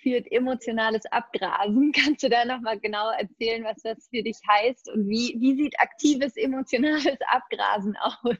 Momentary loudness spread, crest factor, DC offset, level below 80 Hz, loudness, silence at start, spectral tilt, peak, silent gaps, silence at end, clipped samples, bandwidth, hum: 7 LU; 20 dB; under 0.1%; -66 dBFS; -25 LUFS; 0.05 s; -4 dB/octave; -6 dBFS; none; 0.05 s; under 0.1%; 8 kHz; none